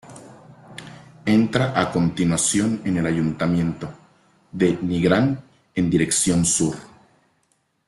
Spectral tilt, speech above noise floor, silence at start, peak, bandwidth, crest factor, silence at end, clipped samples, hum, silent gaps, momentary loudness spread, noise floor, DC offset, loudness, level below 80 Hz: -5 dB/octave; 47 dB; 0.05 s; -2 dBFS; 12.5 kHz; 20 dB; 1 s; under 0.1%; none; none; 19 LU; -67 dBFS; under 0.1%; -21 LUFS; -52 dBFS